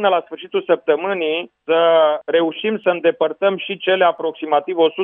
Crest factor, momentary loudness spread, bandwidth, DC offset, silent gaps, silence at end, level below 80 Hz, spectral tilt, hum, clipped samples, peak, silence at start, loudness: 16 dB; 7 LU; 4 kHz; under 0.1%; none; 0 s; -78 dBFS; -8.5 dB/octave; none; under 0.1%; -2 dBFS; 0 s; -18 LUFS